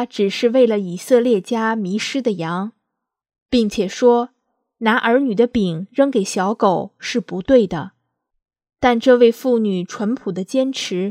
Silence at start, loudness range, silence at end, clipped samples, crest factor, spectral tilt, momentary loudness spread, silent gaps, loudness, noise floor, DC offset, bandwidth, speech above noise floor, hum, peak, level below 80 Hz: 0 s; 2 LU; 0 s; under 0.1%; 18 dB; -5.5 dB/octave; 9 LU; 3.42-3.46 s; -18 LUFS; -79 dBFS; under 0.1%; 15 kHz; 62 dB; none; 0 dBFS; -52 dBFS